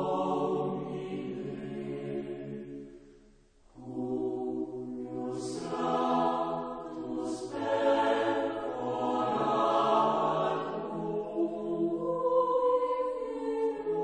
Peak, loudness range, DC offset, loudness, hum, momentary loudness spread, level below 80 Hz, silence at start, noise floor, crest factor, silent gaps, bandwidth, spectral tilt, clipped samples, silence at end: -14 dBFS; 9 LU; under 0.1%; -31 LUFS; none; 12 LU; -64 dBFS; 0 s; -60 dBFS; 18 dB; none; 9.8 kHz; -6.5 dB/octave; under 0.1%; 0 s